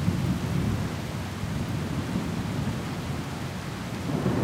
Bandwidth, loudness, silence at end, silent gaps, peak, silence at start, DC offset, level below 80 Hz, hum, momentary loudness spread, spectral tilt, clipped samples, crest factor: 16 kHz; -30 LUFS; 0 s; none; -12 dBFS; 0 s; under 0.1%; -44 dBFS; none; 6 LU; -6.5 dB/octave; under 0.1%; 18 dB